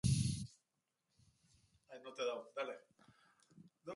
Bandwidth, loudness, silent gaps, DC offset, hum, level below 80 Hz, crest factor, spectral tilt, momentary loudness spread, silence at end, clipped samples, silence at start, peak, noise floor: 11.5 kHz; -43 LUFS; none; under 0.1%; none; -60 dBFS; 22 dB; -5.5 dB/octave; 18 LU; 0 s; under 0.1%; 0.05 s; -22 dBFS; -88 dBFS